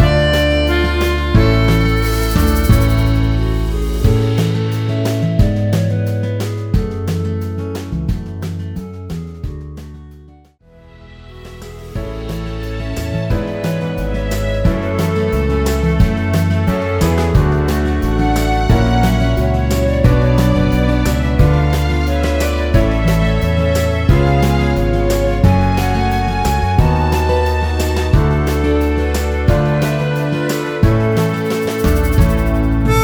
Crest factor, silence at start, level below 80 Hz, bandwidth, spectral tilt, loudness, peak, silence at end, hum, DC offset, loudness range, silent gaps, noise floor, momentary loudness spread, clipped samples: 14 dB; 0 s; -20 dBFS; over 20 kHz; -6.5 dB/octave; -15 LUFS; 0 dBFS; 0 s; none; under 0.1%; 11 LU; none; -45 dBFS; 11 LU; under 0.1%